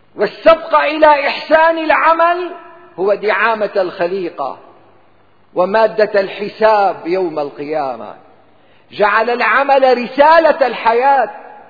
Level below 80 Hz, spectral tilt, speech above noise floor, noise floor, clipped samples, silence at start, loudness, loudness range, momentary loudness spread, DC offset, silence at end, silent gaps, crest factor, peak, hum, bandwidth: -52 dBFS; -6 dB/octave; 39 dB; -52 dBFS; under 0.1%; 0.15 s; -13 LUFS; 5 LU; 11 LU; 0.4%; 0.1 s; none; 14 dB; 0 dBFS; none; 5 kHz